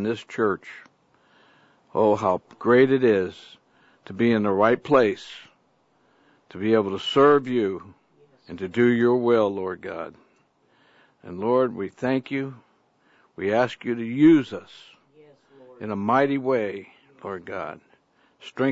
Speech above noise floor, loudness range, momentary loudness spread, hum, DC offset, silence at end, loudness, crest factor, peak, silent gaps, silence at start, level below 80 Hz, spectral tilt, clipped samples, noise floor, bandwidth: 42 dB; 6 LU; 20 LU; none; under 0.1%; 0 s; -22 LUFS; 20 dB; -4 dBFS; none; 0 s; -68 dBFS; -7 dB/octave; under 0.1%; -65 dBFS; 8 kHz